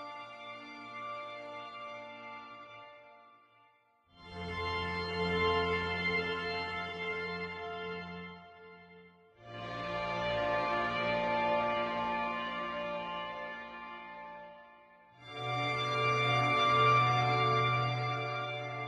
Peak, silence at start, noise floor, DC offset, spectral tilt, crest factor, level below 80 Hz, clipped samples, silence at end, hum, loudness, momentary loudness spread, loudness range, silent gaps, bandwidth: -16 dBFS; 0 s; -68 dBFS; under 0.1%; -5.5 dB/octave; 20 dB; -62 dBFS; under 0.1%; 0 s; none; -33 LUFS; 19 LU; 16 LU; none; 10 kHz